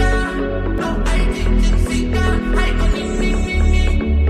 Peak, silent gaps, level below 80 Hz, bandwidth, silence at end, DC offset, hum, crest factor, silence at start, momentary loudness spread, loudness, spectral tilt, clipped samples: -4 dBFS; none; -16 dBFS; 11 kHz; 0 s; under 0.1%; none; 12 dB; 0 s; 4 LU; -19 LUFS; -6 dB/octave; under 0.1%